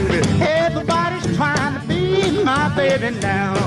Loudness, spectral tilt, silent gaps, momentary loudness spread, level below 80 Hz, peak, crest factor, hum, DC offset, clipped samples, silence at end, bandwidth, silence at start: -18 LUFS; -5.5 dB/octave; none; 4 LU; -38 dBFS; -8 dBFS; 10 dB; none; under 0.1%; under 0.1%; 0 s; 12 kHz; 0 s